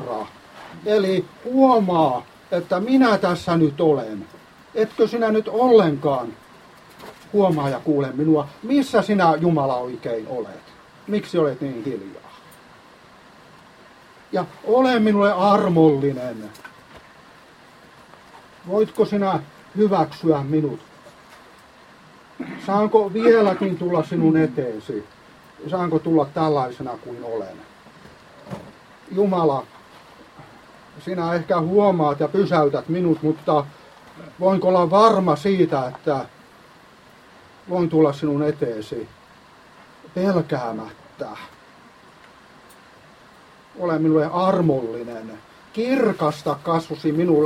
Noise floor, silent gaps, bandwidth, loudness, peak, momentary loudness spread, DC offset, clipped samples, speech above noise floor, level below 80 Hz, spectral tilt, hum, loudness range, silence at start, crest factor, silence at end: -49 dBFS; none; 13.5 kHz; -20 LUFS; -2 dBFS; 18 LU; under 0.1%; under 0.1%; 29 dB; -60 dBFS; -7.5 dB/octave; none; 9 LU; 0 s; 20 dB; 0 s